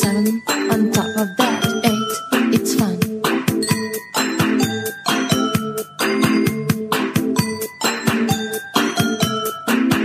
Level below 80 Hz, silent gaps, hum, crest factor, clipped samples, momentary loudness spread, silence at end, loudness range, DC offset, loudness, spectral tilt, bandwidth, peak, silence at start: -54 dBFS; none; none; 16 dB; under 0.1%; 5 LU; 0 s; 1 LU; under 0.1%; -19 LUFS; -4.5 dB/octave; 15.5 kHz; -2 dBFS; 0 s